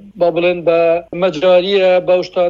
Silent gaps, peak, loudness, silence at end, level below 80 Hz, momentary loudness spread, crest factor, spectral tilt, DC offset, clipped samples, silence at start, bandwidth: none; -2 dBFS; -13 LUFS; 0 s; -52 dBFS; 5 LU; 12 dB; -6 dB/octave; under 0.1%; under 0.1%; 0.05 s; 7.2 kHz